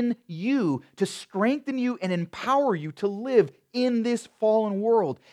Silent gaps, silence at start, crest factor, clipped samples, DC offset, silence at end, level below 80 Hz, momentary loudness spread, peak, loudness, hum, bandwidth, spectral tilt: none; 0 s; 18 dB; under 0.1%; under 0.1%; 0.15 s; -76 dBFS; 6 LU; -8 dBFS; -26 LUFS; none; 12.5 kHz; -6.5 dB/octave